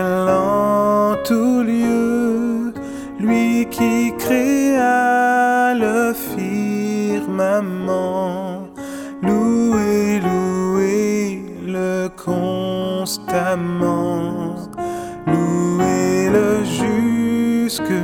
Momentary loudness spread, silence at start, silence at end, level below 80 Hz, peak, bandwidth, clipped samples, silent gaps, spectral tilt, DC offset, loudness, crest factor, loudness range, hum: 10 LU; 0 s; 0 s; -50 dBFS; -4 dBFS; 18.5 kHz; under 0.1%; none; -6 dB/octave; under 0.1%; -18 LUFS; 14 dB; 4 LU; none